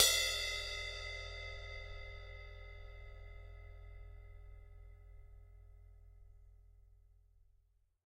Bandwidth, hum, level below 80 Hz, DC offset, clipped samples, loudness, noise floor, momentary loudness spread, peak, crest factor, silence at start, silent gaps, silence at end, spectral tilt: 16 kHz; none; -54 dBFS; under 0.1%; under 0.1%; -39 LUFS; -73 dBFS; 25 LU; -10 dBFS; 32 dB; 0 s; none; 0.65 s; 0.5 dB/octave